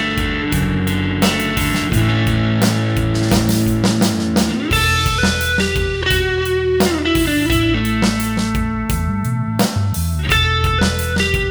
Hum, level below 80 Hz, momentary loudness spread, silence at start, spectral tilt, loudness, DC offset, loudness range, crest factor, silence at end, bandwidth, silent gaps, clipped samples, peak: none; -26 dBFS; 4 LU; 0 s; -5 dB/octave; -17 LUFS; under 0.1%; 2 LU; 14 dB; 0 s; over 20 kHz; none; under 0.1%; -2 dBFS